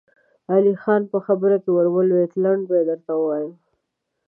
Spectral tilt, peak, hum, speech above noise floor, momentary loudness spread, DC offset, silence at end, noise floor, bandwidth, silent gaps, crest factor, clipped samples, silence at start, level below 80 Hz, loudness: -12 dB/octave; -4 dBFS; none; 58 dB; 5 LU; under 0.1%; 0.75 s; -77 dBFS; 3.3 kHz; none; 16 dB; under 0.1%; 0.5 s; -80 dBFS; -20 LUFS